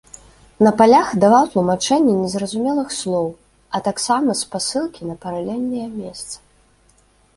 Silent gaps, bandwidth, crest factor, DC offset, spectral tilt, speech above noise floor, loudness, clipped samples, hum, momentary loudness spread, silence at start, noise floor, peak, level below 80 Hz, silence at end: none; 11.5 kHz; 18 dB; under 0.1%; -4.5 dB/octave; 38 dB; -18 LUFS; under 0.1%; none; 16 LU; 0.6 s; -56 dBFS; -2 dBFS; -54 dBFS; 1 s